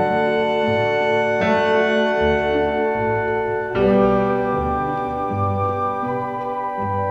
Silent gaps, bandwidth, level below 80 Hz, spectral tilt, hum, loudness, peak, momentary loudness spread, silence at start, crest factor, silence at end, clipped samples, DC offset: none; 7.8 kHz; -42 dBFS; -7 dB/octave; none; -19 LUFS; -6 dBFS; 6 LU; 0 s; 12 dB; 0 s; under 0.1%; under 0.1%